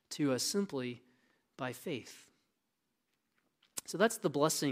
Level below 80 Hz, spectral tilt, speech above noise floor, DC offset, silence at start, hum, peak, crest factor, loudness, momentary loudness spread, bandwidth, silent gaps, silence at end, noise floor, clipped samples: -84 dBFS; -4 dB/octave; 50 dB; under 0.1%; 0.1 s; none; -14 dBFS; 24 dB; -36 LUFS; 14 LU; 16 kHz; none; 0 s; -84 dBFS; under 0.1%